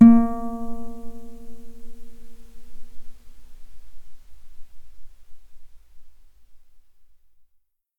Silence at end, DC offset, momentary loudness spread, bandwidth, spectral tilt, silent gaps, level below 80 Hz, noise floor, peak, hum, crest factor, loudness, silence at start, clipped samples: 0.8 s; under 0.1%; 30 LU; 2.5 kHz; -9.5 dB/octave; none; -42 dBFS; -65 dBFS; -2 dBFS; none; 22 dB; -21 LUFS; 0 s; under 0.1%